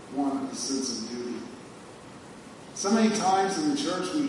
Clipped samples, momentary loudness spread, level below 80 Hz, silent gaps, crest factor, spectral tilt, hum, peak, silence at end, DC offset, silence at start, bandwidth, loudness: under 0.1%; 22 LU; -68 dBFS; none; 18 dB; -3.5 dB/octave; none; -12 dBFS; 0 s; under 0.1%; 0 s; 11.5 kHz; -27 LUFS